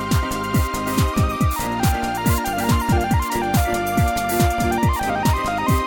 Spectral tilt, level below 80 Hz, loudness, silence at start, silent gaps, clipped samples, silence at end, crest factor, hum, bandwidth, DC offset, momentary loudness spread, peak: -5.5 dB/octave; -28 dBFS; -20 LUFS; 0 s; none; under 0.1%; 0 s; 14 dB; none; over 20 kHz; under 0.1%; 2 LU; -6 dBFS